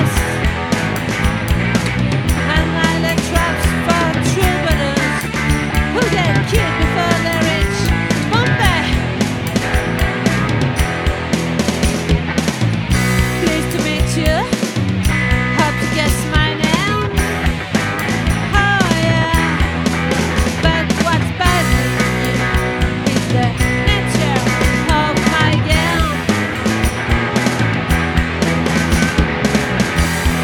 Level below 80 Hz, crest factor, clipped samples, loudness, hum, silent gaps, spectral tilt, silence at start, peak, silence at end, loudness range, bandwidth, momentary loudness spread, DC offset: -24 dBFS; 16 dB; under 0.1%; -15 LUFS; none; none; -5 dB/octave; 0 s; 0 dBFS; 0 s; 2 LU; 19 kHz; 3 LU; under 0.1%